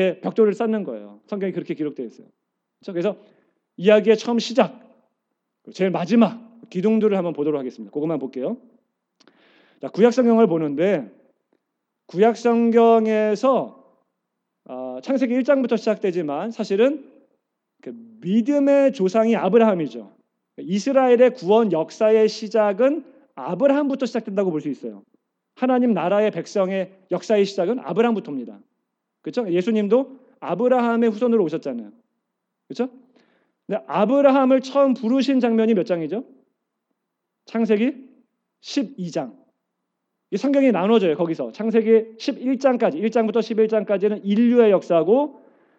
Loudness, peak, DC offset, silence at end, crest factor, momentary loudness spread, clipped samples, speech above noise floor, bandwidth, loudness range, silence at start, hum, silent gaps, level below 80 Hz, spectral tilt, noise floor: -20 LUFS; -2 dBFS; under 0.1%; 0.45 s; 18 dB; 15 LU; under 0.1%; 60 dB; 8 kHz; 6 LU; 0 s; none; none; under -90 dBFS; -6.5 dB/octave; -79 dBFS